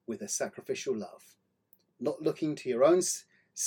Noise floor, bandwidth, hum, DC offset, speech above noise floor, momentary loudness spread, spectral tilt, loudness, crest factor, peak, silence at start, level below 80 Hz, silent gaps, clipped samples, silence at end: -68 dBFS; 17.5 kHz; none; under 0.1%; 38 dB; 13 LU; -3.5 dB/octave; -31 LUFS; 20 dB; -12 dBFS; 0.1 s; -84 dBFS; none; under 0.1%; 0 s